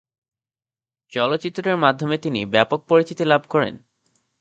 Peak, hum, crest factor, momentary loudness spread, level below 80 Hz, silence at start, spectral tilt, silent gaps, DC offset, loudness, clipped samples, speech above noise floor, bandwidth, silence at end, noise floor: 0 dBFS; none; 22 dB; 6 LU; -62 dBFS; 1.15 s; -6 dB/octave; none; under 0.1%; -20 LUFS; under 0.1%; over 70 dB; 8 kHz; 0.65 s; under -90 dBFS